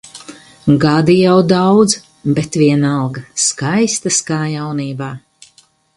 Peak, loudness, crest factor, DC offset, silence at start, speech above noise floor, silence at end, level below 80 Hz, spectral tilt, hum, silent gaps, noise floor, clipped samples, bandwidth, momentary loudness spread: 0 dBFS; -14 LUFS; 14 dB; under 0.1%; 0.05 s; 38 dB; 0.8 s; -50 dBFS; -5 dB/octave; none; none; -51 dBFS; under 0.1%; 11.5 kHz; 13 LU